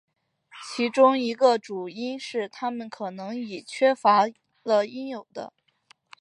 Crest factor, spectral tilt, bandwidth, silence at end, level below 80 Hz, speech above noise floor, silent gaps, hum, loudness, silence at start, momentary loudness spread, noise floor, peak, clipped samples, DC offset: 20 dB; -4.5 dB/octave; 11 kHz; 0.75 s; -80 dBFS; 37 dB; none; none; -25 LUFS; 0.55 s; 17 LU; -61 dBFS; -6 dBFS; under 0.1%; under 0.1%